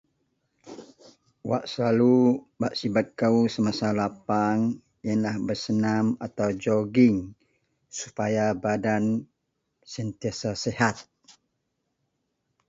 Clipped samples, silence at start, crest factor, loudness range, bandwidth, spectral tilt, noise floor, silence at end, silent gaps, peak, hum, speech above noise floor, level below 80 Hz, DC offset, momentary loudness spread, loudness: under 0.1%; 0.65 s; 20 dB; 5 LU; 7.8 kHz; -6 dB/octave; -78 dBFS; 1.65 s; none; -6 dBFS; none; 54 dB; -60 dBFS; under 0.1%; 15 LU; -25 LUFS